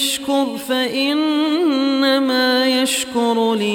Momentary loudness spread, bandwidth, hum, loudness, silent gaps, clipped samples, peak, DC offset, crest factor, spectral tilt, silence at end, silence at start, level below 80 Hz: 4 LU; 17 kHz; none; -17 LUFS; none; under 0.1%; -4 dBFS; under 0.1%; 12 dB; -2.5 dB/octave; 0 s; 0 s; -64 dBFS